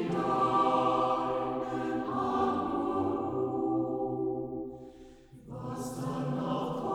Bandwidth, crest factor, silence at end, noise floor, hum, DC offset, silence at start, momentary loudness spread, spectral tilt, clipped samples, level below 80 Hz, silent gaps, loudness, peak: 14.5 kHz; 16 dB; 0 s; -52 dBFS; none; under 0.1%; 0 s; 13 LU; -7 dB/octave; under 0.1%; -60 dBFS; none; -31 LUFS; -14 dBFS